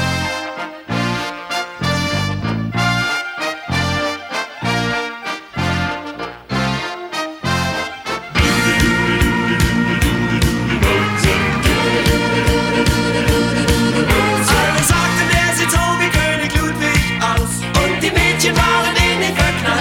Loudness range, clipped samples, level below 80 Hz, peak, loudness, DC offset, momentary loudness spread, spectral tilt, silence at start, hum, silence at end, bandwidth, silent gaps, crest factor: 6 LU; under 0.1%; -26 dBFS; 0 dBFS; -16 LUFS; under 0.1%; 9 LU; -4 dB/octave; 0 s; none; 0 s; 17.5 kHz; none; 16 dB